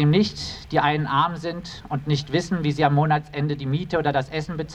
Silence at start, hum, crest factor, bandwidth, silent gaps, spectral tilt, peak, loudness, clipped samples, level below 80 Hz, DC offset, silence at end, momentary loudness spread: 0 s; none; 20 dB; 8.8 kHz; none; -6.5 dB/octave; -4 dBFS; -23 LUFS; under 0.1%; -48 dBFS; under 0.1%; 0 s; 10 LU